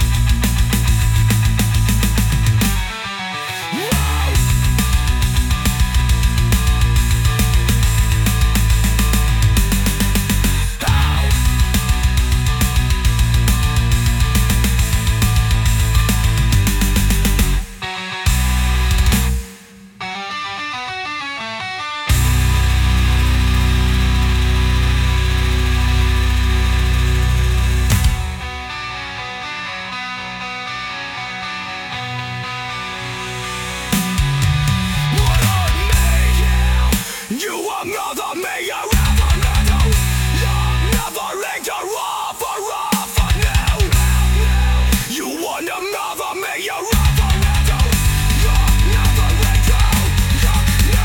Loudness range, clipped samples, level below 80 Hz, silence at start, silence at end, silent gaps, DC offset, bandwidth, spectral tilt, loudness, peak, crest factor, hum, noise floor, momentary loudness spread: 5 LU; under 0.1%; -18 dBFS; 0 s; 0 s; none; under 0.1%; 18 kHz; -4.5 dB/octave; -17 LUFS; -2 dBFS; 14 dB; none; -39 dBFS; 9 LU